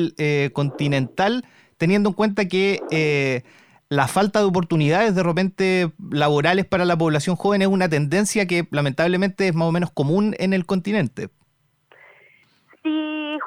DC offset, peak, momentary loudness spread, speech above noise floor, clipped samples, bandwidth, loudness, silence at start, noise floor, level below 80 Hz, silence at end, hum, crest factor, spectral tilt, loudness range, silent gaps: under 0.1%; -2 dBFS; 6 LU; 45 dB; under 0.1%; 15 kHz; -20 LUFS; 0 s; -65 dBFS; -56 dBFS; 0 s; none; 18 dB; -6 dB/octave; 4 LU; none